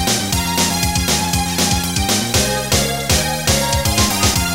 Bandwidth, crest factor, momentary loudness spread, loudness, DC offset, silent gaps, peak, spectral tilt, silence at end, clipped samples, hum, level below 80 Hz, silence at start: 16.5 kHz; 16 dB; 2 LU; -15 LUFS; 0.6%; none; 0 dBFS; -3 dB/octave; 0 s; under 0.1%; none; -28 dBFS; 0 s